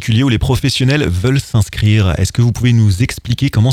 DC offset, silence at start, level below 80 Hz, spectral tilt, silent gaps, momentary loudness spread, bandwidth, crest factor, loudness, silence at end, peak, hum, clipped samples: under 0.1%; 0 s; -30 dBFS; -6 dB/octave; none; 4 LU; 15 kHz; 12 dB; -14 LUFS; 0 s; 0 dBFS; none; under 0.1%